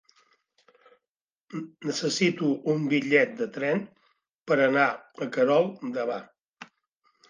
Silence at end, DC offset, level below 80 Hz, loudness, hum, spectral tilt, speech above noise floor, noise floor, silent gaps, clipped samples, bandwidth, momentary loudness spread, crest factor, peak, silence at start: 0.65 s; under 0.1%; -80 dBFS; -26 LUFS; none; -5 dB/octave; over 64 dB; under -90 dBFS; 4.35-4.42 s, 6.48-6.53 s; under 0.1%; 9.8 kHz; 15 LU; 20 dB; -8 dBFS; 1.5 s